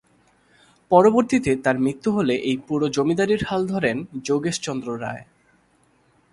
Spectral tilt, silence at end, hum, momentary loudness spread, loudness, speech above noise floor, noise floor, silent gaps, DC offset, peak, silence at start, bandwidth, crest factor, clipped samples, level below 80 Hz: -5.5 dB/octave; 1.1 s; none; 12 LU; -21 LUFS; 40 dB; -61 dBFS; none; under 0.1%; -2 dBFS; 0.9 s; 11.5 kHz; 20 dB; under 0.1%; -54 dBFS